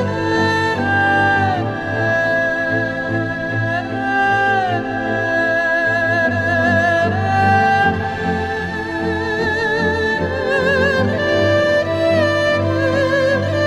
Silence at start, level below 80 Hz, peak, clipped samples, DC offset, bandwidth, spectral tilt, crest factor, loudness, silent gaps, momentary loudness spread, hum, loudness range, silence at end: 0 s; -44 dBFS; -4 dBFS; under 0.1%; under 0.1%; 12 kHz; -6 dB/octave; 14 dB; -16 LUFS; none; 6 LU; none; 2 LU; 0 s